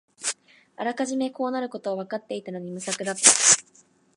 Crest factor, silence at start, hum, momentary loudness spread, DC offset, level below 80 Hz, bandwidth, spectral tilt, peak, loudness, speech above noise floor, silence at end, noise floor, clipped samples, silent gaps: 26 dB; 0.2 s; none; 17 LU; under 0.1%; -80 dBFS; 11.5 kHz; -1 dB/octave; 0 dBFS; -22 LUFS; 35 dB; 0.55 s; -59 dBFS; under 0.1%; none